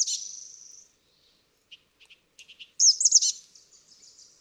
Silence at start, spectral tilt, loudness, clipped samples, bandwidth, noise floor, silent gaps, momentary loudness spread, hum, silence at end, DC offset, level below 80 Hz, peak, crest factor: 0 s; 6 dB/octave; -20 LUFS; under 0.1%; 15 kHz; -66 dBFS; none; 24 LU; none; 1.05 s; under 0.1%; -82 dBFS; -6 dBFS; 24 dB